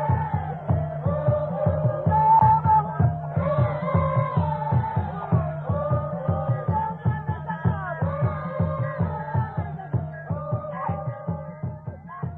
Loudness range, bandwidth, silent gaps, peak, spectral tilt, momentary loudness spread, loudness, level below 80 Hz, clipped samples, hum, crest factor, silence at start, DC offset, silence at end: 7 LU; 4.1 kHz; none; -6 dBFS; -12 dB/octave; 11 LU; -25 LUFS; -44 dBFS; under 0.1%; none; 16 dB; 0 s; under 0.1%; 0 s